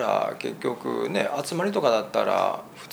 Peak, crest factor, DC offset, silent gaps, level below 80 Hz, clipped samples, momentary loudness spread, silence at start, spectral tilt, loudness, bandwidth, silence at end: -6 dBFS; 18 dB; under 0.1%; none; -72 dBFS; under 0.1%; 7 LU; 0 s; -4.5 dB/octave; -26 LUFS; over 20 kHz; 0 s